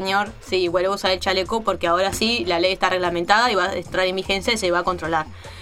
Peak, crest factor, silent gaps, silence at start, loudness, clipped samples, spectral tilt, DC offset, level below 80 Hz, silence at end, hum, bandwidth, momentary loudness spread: 0 dBFS; 20 dB; none; 0 s; -20 LUFS; under 0.1%; -3.5 dB/octave; under 0.1%; -44 dBFS; 0 s; none; 16.5 kHz; 5 LU